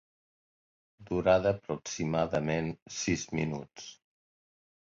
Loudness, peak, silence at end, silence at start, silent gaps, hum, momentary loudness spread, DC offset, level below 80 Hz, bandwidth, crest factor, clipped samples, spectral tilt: -31 LUFS; -12 dBFS; 0.95 s; 1 s; 2.82-2.86 s; none; 14 LU; under 0.1%; -56 dBFS; 7.8 kHz; 20 dB; under 0.1%; -5 dB/octave